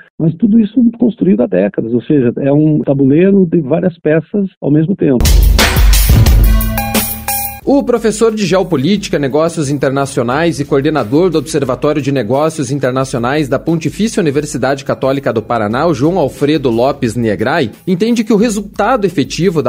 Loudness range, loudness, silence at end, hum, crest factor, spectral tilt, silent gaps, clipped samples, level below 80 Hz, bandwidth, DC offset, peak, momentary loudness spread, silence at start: 3 LU; -12 LUFS; 0 s; none; 12 dB; -6 dB/octave; 4.57-4.61 s; under 0.1%; -20 dBFS; 16.5 kHz; under 0.1%; 0 dBFS; 6 LU; 0.2 s